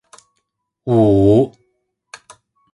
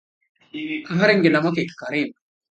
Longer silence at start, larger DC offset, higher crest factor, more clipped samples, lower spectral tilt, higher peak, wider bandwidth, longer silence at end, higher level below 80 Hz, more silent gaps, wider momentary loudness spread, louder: first, 0.85 s vs 0.55 s; neither; about the same, 18 dB vs 20 dB; neither; first, -9 dB/octave vs -6.5 dB/octave; about the same, 0 dBFS vs -2 dBFS; first, 11 kHz vs 8.8 kHz; first, 1.25 s vs 0.4 s; first, -42 dBFS vs -68 dBFS; neither; about the same, 12 LU vs 14 LU; first, -14 LUFS vs -20 LUFS